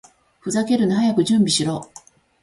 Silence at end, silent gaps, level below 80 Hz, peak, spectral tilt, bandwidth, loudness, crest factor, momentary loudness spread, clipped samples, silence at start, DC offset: 0.6 s; none; -58 dBFS; -6 dBFS; -4.5 dB/octave; 11.5 kHz; -19 LUFS; 14 dB; 11 LU; under 0.1%; 0.45 s; under 0.1%